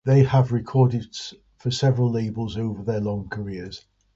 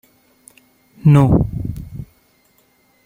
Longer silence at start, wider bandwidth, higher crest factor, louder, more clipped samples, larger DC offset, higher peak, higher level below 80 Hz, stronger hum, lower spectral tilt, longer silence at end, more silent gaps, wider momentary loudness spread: second, 0.05 s vs 1.05 s; second, 7.8 kHz vs 15.5 kHz; about the same, 18 dB vs 18 dB; second, -23 LUFS vs -15 LUFS; neither; neither; about the same, -4 dBFS vs -2 dBFS; second, -50 dBFS vs -34 dBFS; neither; second, -7 dB/octave vs -9.5 dB/octave; second, 0.35 s vs 1 s; neither; second, 16 LU vs 22 LU